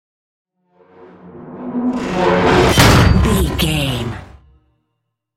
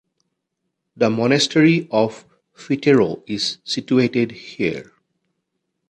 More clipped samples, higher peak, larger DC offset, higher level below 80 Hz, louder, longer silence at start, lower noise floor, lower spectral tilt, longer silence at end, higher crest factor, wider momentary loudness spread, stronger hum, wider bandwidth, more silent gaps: neither; about the same, 0 dBFS vs -2 dBFS; neither; first, -26 dBFS vs -60 dBFS; first, -14 LUFS vs -19 LUFS; first, 1.25 s vs 0.95 s; second, -73 dBFS vs -77 dBFS; about the same, -5 dB/octave vs -5 dB/octave; about the same, 1.1 s vs 1.1 s; about the same, 16 dB vs 18 dB; first, 18 LU vs 9 LU; neither; first, 16.5 kHz vs 10.5 kHz; neither